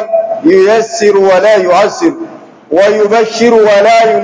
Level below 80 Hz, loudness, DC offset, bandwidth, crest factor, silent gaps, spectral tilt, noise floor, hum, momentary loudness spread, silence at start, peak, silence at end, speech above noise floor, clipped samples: -56 dBFS; -8 LUFS; under 0.1%; 8 kHz; 8 dB; none; -4 dB/octave; -28 dBFS; none; 8 LU; 0 s; 0 dBFS; 0 s; 21 dB; 3%